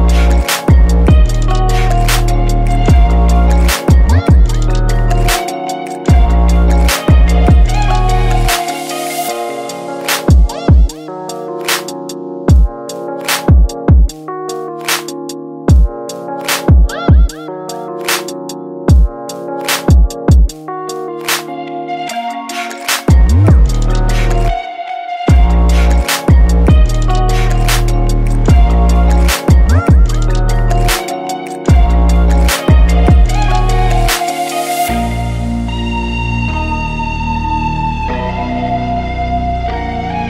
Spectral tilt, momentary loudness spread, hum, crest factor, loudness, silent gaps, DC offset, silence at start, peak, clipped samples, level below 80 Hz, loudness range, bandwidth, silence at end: -5.5 dB/octave; 11 LU; none; 10 dB; -13 LUFS; none; under 0.1%; 0 s; 0 dBFS; under 0.1%; -12 dBFS; 4 LU; 16.5 kHz; 0 s